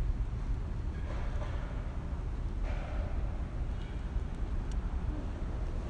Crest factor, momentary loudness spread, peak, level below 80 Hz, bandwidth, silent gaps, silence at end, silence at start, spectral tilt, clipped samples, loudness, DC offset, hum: 12 dB; 2 LU; -22 dBFS; -36 dBFS; 8.8 kHz; none; 0 s; 0 s; -7.5 dB/octave; under 0.1%; -39 LUFS; under 0.1%; none